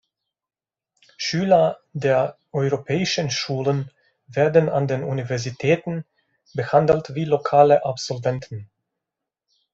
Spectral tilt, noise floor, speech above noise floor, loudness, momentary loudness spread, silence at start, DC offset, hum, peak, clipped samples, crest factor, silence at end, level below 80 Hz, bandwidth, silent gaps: -5.5 dB/octave; under -90 dBFS; over 70 dB; -21 LUFS; 13 LU; 1.2 s; under 0.1%; none; -2 dBFS; under 0.1%; 20 dB; 1.1 s; -60 dBFS; 8 kHz; none